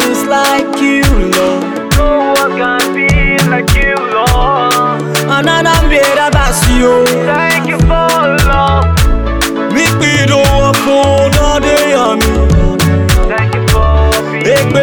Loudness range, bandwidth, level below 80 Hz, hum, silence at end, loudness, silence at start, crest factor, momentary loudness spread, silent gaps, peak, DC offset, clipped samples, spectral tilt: 1 LU; over 20 kHz; -16 dBFS; none; 0 s; -10 LUFS; 0 s; 8 dB; 3 LU; none; 0 dBFS; under 0.1%; under 0.1%; -5 dB/octave